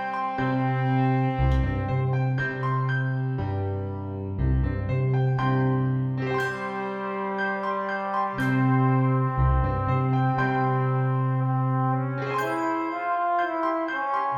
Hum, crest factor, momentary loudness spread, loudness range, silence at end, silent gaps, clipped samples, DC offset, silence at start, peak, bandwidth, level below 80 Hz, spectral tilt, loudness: none; 12 dB; 5 LU; 3 LU; 0 s; none; under 0.1%; under 0.1%; 0 s; -12 dBFS; 7 kHz; -36 dBFS; -8.5 dB/octave; -25 LUFS